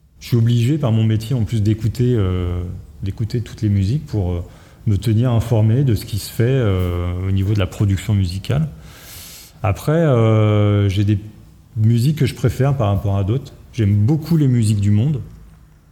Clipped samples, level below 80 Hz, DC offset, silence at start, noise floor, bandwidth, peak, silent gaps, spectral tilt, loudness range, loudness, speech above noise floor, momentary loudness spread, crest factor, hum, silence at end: under 0.1%; -38 dBFS; under 0.1%; 0.2 s; -44 dBFS; 15 kHz; -4 dBFS; none; -7.5 dB/octave; 3 LU; -18 LUFS; 28 dB; 11 LU; 12 dB; none; 0.5 s